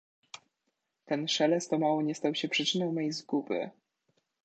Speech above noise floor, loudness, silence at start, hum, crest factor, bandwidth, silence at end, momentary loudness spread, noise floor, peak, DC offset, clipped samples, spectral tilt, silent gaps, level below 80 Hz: 52 dB; -30 LUFS; 1.05 s; none; 18 dB; 9 kHz; 0.75 s; 21 LU; -82 dBFS; -14 dBFS; under 0.1%; under 0.1%; -4 dB/octave; none; -84 dBFS